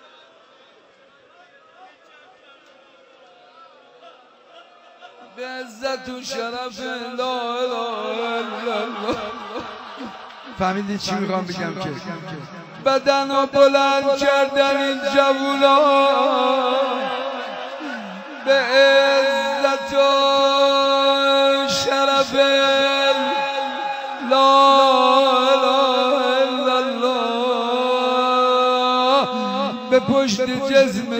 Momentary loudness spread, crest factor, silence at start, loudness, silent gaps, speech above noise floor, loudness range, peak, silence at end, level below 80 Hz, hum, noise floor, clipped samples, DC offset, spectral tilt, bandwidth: 15 LU; 16 dB; 1.8 s; -18 LUFS; none; 33 dB; 11 LU; -4 dBFS; 0 s; -60 dBFS; none; -52 dBFS; under 0.1%; under 0.1%; -3.5 dB/octave; 16 kHz